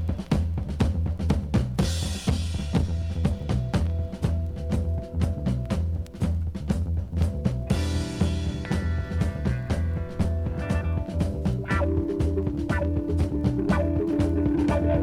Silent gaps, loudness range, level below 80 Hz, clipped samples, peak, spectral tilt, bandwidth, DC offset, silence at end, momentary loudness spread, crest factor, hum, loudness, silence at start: none; 2 LU; -32 dBFS; under 0.1%; -8 dBFS; -7 dB/octave; 11.5 kHz; under 0.1%; 0 s; 4 LU; 18 dB; none; -27 LUFS; 0 s